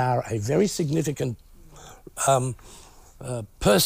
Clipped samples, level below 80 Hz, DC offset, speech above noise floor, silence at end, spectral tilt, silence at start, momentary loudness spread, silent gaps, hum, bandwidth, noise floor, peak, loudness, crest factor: under 0.1%; -46 dBFS; under 0.1%; 22 dB; 0 s; -4.5 dB/octave; 0 s; 19 LU; none; none; 16 kHz; -46 dBFS; -8 dBFS; -25 LUFS; 18 dB